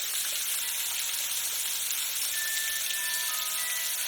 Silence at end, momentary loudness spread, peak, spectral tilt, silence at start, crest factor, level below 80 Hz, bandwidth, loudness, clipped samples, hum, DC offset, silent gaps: 0 s; 1 LU; -12 dBFS; 4 dB/octave; 0 s; 18 dB; -70 dBFS; 19.5 kHz; -28 LUFS; under 0.1%; none; under 0.1%; none